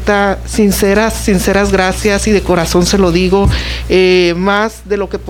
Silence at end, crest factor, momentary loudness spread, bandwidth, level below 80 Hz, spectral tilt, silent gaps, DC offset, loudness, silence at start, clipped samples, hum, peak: 0 s; 10 dB; 5 LU; 18 kHz; -22 dBFS; -5 dB/octave; none; under 0.1%; -11 LUFS; 0 s; under 0.1%; none; 0 dBFS